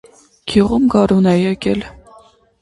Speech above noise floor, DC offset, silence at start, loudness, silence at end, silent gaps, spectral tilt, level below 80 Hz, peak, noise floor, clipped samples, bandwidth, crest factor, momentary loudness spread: 32 dB; under 0.1%; 0.45 s; -15 LUFS; 0.7 s; none; -7 dB/octave; -40 dBFS; 0 dBFS; -47 dBFS; under 0.1%; 11.5 kHz; 16 dB; 13 LU